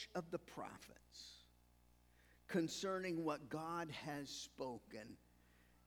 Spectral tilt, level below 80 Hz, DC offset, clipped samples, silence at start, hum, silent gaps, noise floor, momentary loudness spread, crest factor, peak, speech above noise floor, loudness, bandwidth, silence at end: -4.5 dB/octave; -74 dBFS; under 0.1%; under 0.1%; 0 s; 60 Hz at -70 dBFS; none; -72 dBFS; 17 LU; 20 dB; -28 dBFS; 25 dB; -46 LUFS; over 20 kHz; 0.1 s